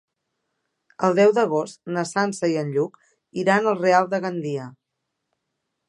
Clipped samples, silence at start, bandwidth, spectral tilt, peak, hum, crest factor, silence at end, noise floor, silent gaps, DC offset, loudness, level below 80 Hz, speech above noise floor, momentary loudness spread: under 0.1%; 1 s; 11.5 kHz; -5.5 dB/octave; -4 dBFS; none; 20 dB; 1.2 s; -80 dBFS; none; under 0.1%; -22 LUFS; -76 dBFS; 58 dB; 12 LU